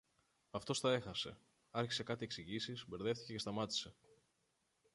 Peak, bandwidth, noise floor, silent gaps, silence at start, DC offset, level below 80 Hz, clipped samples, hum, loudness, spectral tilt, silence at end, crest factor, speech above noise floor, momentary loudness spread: -24 dBFS; 11.5 kHz; -82 dBFS; none; 0.55 s; under 0.1%; -72 dBFS; under 0.1%; none; -42 LUFS; -4 dB/octave; 1.05 s; 20 dB; 40 dB; 10 LU